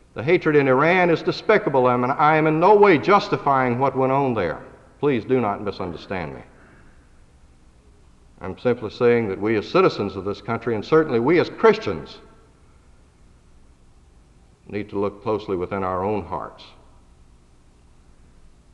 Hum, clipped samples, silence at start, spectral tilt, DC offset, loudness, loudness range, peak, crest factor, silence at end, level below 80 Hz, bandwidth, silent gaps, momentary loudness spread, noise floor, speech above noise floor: none; under 0.1%; 0.15 s; -7.5 dB/octave; under 0.1%; -20 LUFS; 14 LU; -4 dBFS; 18 dB; 2.1 s; -52 dBFS; 7.8 kHz; none; 15 LU; -52 dBFS; 32 dB